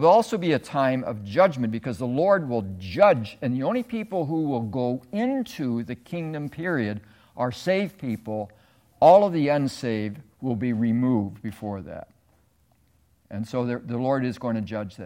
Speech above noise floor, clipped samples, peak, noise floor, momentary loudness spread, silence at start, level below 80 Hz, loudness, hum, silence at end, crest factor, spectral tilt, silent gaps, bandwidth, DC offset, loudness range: 40 dB; under 0.1%; -4 dBFS; -64 dBFS; 14 LU; 0 s; -62 dBFS; -25 LUFS; none; 0 s; 20 dB; -7.5 dB/octave; none; 16.5 kHz; under 0.1%; 7 LU